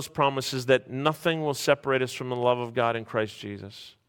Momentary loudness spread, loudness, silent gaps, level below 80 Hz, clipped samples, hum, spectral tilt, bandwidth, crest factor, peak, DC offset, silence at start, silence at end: 11 LU; -26 LUFS; none; -66 dBFS; under 0.1%; none; -4.5 dB/octave; 17.5 kHz; 20 dB; -6 dBFS; under 0.1%; 0 s; 0.2 s